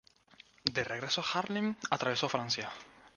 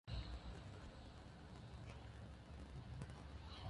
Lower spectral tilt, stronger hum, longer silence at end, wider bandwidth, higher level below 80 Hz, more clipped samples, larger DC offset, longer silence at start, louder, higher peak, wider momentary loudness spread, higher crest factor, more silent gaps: second, -3.5 dB/octave vs -6 dB/octave; neither; about the same, 0.1 s vs 0 s; about the same, 10 kHz vs 11 kHz; second, -70 dBFS vs -58 dBFS; neither; neither; first, 0.65 s vs 0.05 s; first, -34 LUFS vs -56 LUFS; first, -10 dBFS vs -34 dBFS; about the same, 4 LU vs 6 LU; first, 26 dB vs 20 dB; neither